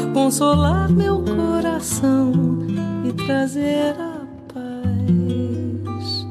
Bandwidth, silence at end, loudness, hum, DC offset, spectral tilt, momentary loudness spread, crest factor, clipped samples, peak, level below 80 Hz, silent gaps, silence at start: 15 kHz; 0 s; -20 LUFS; none; under 0.1%; -6 dB/octave; 10 LU; 14 dB; under 0.1%; -6 dBFS; -38 dBFS; none; 0 s